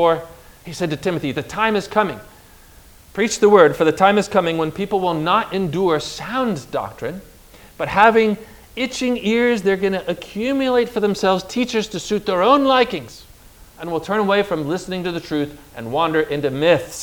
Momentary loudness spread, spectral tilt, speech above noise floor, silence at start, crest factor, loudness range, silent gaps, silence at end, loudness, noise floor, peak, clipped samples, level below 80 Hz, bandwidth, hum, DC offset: 13 LU; -5 dB/octave; 27 dB; 0 s; 18 dB; 5 LU; none; 0 s; -19 LUFS; -45 dBFS; 0 dBFS; under 0.1%; -48 dBFS; over 20 kHz; none; under 0.1%